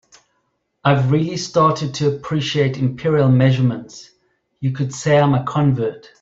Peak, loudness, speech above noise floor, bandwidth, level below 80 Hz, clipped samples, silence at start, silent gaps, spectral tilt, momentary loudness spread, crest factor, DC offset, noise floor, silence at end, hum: -2 dBFS; -18 LUFS; 52 dB; 7.8 kHz; -52 dBFS; under 0.1%; 0.85 s; none; -6.5 dB/octave; 8 LU; 16 dB; under 0.1%; -69 dBFS; 0.25 s; none